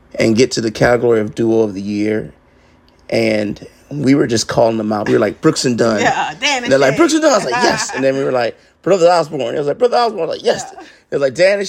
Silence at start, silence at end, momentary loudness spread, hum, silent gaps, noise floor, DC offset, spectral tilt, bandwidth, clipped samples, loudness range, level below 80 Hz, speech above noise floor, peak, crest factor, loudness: 0.15 s; 0 s; 8 LU; none; none; -49 dBFS; under 0.1%; -4.5 dB/octave; 16 kHz; under 0.1%; 4 LU; -50 dBFS; 35 dB; 0 dBFS; 14 dB; -15 LUFS